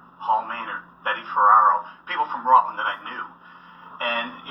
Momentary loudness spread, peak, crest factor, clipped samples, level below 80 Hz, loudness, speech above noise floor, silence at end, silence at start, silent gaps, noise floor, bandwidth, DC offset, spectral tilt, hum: 16 LU; -4 dBFS; 20 dB; under 0.1%; -72 dBFS; -21 LUFS; 23 dB; 0 s; 0.2 s; none; -44 dBFS; 5.8 kHz; under 0.1%; -5 dB/octave; none